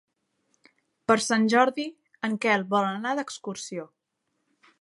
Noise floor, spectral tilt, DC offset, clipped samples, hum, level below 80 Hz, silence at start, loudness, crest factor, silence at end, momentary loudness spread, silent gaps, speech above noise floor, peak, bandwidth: -78 dBFS; -4 dB/octave; under 0.1%; under 0.1%; none; -76 dBFS; 1.1 s; -25 LUFS; 22 dB; 0.95 s; 14 LU; none; 53 dB; -6 dBFS; 11.5 kHz